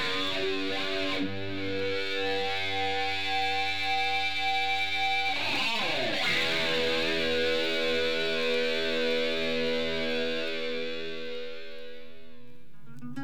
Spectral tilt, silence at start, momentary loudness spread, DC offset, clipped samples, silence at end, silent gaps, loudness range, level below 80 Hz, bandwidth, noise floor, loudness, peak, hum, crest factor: -3.5 dB/octave; 0 s; 9 LU; 2%; under 0.1%; 0 s; none; 5 LU; -60 dBFS; 18.5 kHz; -55 dBFS; -28 LUFS; -16 dBFS; none; 14 dB